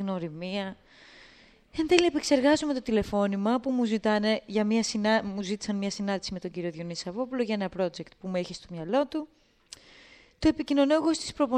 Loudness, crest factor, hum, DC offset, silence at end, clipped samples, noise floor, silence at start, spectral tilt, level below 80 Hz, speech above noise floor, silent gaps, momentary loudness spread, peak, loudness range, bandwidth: -28 LUFS; 26 dB; none; under 0.1%; 0 s; under 0.1%; -56 dBFS; 0 s; -5 dB/octave; -54 dBFS; 29 dB; none; 13 LU; -2 dBFS; 6 LU; 11 kHz